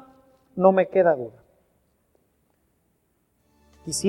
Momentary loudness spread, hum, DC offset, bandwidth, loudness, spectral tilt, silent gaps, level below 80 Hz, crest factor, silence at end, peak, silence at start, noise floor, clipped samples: 20 LU; none; under 0.1%; 13 kHz; -21 LUFS; -5 dB/octave; none; -64 dBFS; 24 dB; 0 s; -2 dBFS; 0.55 s; -69 dBFS; under 0.1%